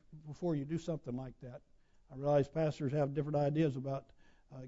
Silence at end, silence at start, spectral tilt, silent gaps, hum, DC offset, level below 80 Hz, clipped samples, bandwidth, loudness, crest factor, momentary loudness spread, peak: 0 s; 0.1 s; -8 dB/octave; none; none; under 0.1%; -62 dBFS; under 0.1%; 7.6 kHz; -36 LUFS; 16 dB; 20 LU; -20 dBFS